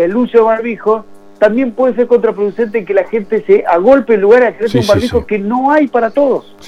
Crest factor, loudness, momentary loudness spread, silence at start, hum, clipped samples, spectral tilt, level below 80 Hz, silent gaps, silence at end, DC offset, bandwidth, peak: 12 dB; -12 LUFS; 7 LU; 0 s; none; 0.1%; -6.5 dB/octave; -42 dBFS; none; 0 s; under 0.1%; 12.5 kHz; 0 dBFS